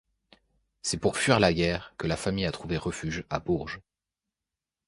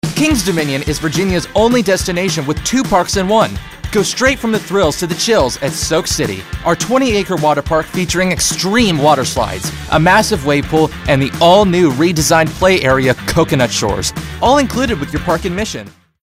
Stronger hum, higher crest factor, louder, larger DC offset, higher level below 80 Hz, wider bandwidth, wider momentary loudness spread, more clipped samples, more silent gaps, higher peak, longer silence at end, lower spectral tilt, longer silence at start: neither; first, 24 dB vs 14 dB; second, -28 LUFS vs -13 LUFS; second, under 0.1% vs 0.2%; second, -48 dBFS vs -32 dBFS; second, 11.5 kHz vs 16 kHz; first, 11 LU vs 7 LU; neither; neither; second, -6 dBFS vs 0 dBFS; first, 1.1 s vs 0.35 s; about the same, -4.5 dB/octave vs -4 dB/octave; first, 0.85 s vs 0.05 s